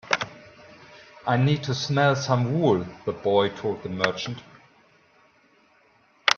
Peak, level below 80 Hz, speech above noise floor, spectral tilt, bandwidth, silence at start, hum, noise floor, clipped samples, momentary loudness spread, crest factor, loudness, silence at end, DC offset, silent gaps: 0 dBFS; -62 dBFS; 37 dB; -5.5 dB/octave; 7.2 kHz; 0.05 s; none; -60 dBFS; under 0.1%; 11 LU; 26 dB; -25 LUFS; 0 s; under 0.1%; none